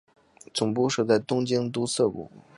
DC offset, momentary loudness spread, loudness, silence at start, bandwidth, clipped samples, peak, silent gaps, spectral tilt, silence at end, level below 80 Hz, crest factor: under 0.1%; 6 LU; -26 LUFS; 0.55 s; 11.5 kHz; under 0.1%; -8 dBFS; none; -5 dB/octave; 0.15 s; -64 dBFS; 18 dB